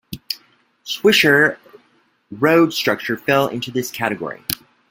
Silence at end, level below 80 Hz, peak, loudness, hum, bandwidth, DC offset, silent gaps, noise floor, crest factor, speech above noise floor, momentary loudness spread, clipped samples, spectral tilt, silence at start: 0.35 s; -58 dBFS; 0 dBFS; -18 LUFS; none; 17 kHz; under 0.1%; none; -59 dBFS; 20 dB; 42 dB; 15 LU; under 0.1%; -4 dB/octave; 0.1 s